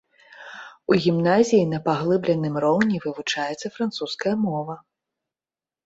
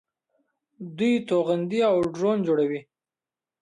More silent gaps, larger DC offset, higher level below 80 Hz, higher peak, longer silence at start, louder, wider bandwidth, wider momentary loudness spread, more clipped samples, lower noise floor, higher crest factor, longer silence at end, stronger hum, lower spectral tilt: neither; neither; first, -62 dBFS vs -68 dBFS; first, -4 dBFS vs -12 dBFS; second, 0.4 s vs 0.8 s; about the same, -22 LUFS vs -24 LUFS; second, 8 kHz vs 11 kHz; first, 16 LU vs 11 LU; neither; about the same, under -90 dBFS vs under -90 dBFS; about the same, 18 dB vs 14 dB; first, 1.05 s vs 0.8 s; neither; about the same, -6 dB/octave vs -7 dB/octave